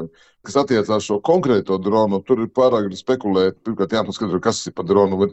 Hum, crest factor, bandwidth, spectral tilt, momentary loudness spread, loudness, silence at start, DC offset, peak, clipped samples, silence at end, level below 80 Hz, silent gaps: none; 16 dB; 8.4 kHz; -6 dB/octave; 5 LU; -19 LUFS; 0 s; under 0.1%; -2 dBFS; under 0.1%; 0 s; -56 dBFS; none